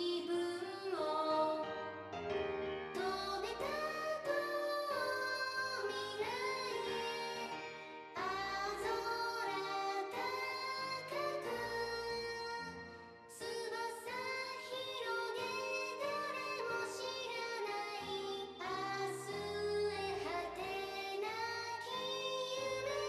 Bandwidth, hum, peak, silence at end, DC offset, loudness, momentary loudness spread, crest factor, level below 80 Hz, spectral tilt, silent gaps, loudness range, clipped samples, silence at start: 14.5 kHz; none; -24 dBFS; 0 s; under 0.1%; -40 LUFS; 5 LU; 16 dB; -72 dBFS; -3 dB/octave; none; 3 LU; under 0.1%; 0 s